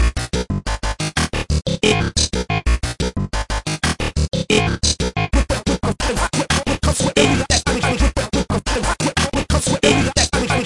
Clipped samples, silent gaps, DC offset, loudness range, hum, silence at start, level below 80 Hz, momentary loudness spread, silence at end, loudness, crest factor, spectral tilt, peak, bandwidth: under 0.1%; none; under 0.1%; 2 LU; none; 0 s; -24 dBFS; 7 LU; 0 s; -18 LUFS; 16 dB; -4 dB/octave; -2 dBFS; 12 kHz